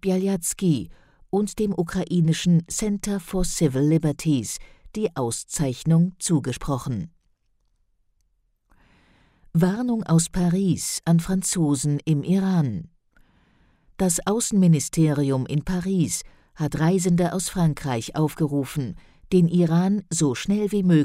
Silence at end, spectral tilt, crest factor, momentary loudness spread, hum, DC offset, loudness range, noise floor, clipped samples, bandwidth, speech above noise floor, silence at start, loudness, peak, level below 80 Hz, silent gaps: 0 s; -6 dB/octave; 16 dB; 8 LU; none; under 0.1%; 4 LU; -68 dBFS; under 0.1%; 15.5 kHz; 46 dB; 0.05 s; -23 LUFS; -8 dBFS; -44 dBFS; none